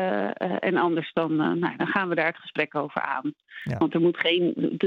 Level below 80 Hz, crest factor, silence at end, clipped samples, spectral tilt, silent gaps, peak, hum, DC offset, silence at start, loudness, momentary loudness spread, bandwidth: -68 dBFS; 18 dB; 0 s; under 0.1%; -8 dB/octave; none; -8 dBFS; none; under 0.1%; 0 s; -25 LUFS; 6 LU; 5.6 kHz